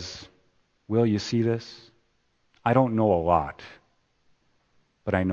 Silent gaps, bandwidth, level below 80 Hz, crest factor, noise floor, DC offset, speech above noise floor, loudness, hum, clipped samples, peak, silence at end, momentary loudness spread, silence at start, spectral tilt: none; 7.4 kHz; -54 dBFS; 22 dB; -69 dBFS; under 0.1%; 46 dB; -25 LUFS; none; under 0.1%; -4 dBFS; 0 s; 21 LU; 0 s; -7 dB/octave